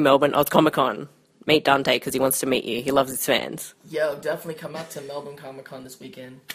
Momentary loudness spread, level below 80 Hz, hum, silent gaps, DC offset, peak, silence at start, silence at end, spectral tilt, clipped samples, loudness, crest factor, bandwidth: 21 LU; -60 dBFS; none; none; under 0.1%; 0 dBFS; 0 s; 0 s; -3.5 dB/octave; under 0.1%; -22 LUFS; 22 dB; 15.5 kHz